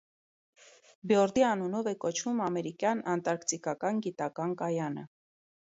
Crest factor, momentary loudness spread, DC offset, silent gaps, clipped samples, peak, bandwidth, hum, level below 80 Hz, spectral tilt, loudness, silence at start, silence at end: 20 dB; 8 LU; under 0.1%; none; under 0.1%; -12 dBFS; 8.2 kHz; none; -74 dBFS; -4.5 dB/octave; -31 LUFS; 1.05 s; 0.7 s